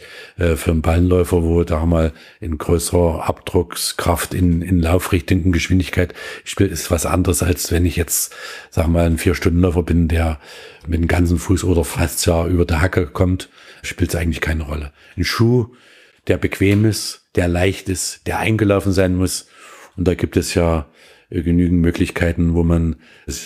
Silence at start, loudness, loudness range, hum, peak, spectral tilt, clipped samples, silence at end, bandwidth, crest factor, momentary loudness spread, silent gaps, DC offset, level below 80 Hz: 0 s; -18 LUFS; 2 LU; none; 0 dBFS; -5.5 dB/octave; under 0.1%; 0 s; 15.5 kHz; 16 dB; 9 LU; none; under 0.1%; -28 dBFS